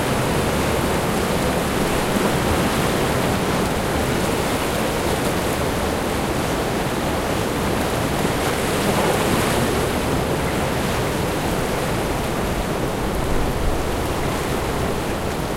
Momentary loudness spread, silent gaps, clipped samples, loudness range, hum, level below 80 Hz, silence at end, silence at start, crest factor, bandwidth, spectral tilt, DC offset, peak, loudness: 4 LU; none; under 0.1%; 3 LU; none; -32 dBFS; 0 s; 0 s; 14 dB; 16 kHz; -4.5 dB/octave; under 0.1%; -6 dBFS; -21 LUFS